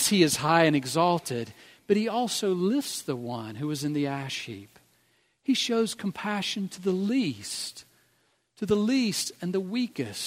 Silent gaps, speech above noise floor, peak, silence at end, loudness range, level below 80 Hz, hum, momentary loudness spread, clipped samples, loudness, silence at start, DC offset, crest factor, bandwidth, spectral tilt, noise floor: none; 42 dB; -6 dBFS; 0 s; 4 LU; -68 dBFS; none; 13 LU; under 0.1%; -27 LUFS; 0 s; under 0.1%; 22 dB; 16 kHz; -4 dB/octave; -69 dBFS